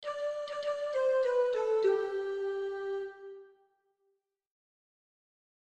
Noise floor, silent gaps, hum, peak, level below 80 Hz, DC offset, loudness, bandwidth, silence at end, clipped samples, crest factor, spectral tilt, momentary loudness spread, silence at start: -79 dBFS; none; none; -18 dBFS; -80 dBFS; under 0.1%; -32 LUFS; 9 kHz; 2.3 s; under 0.1%; 16 dB; -3.5 dB/octave; 11 LU; 0 s